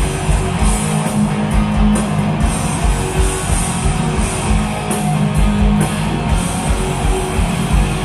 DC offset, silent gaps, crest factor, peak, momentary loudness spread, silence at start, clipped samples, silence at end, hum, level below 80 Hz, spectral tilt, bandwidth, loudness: under 0.1%; none; 14 dB; -2 dBFS; 3 LU; 0 s; under 0.1%; 0 s; none; -20 dBFS; -5.5 dB/octave; 13 kHz; -16 LUFS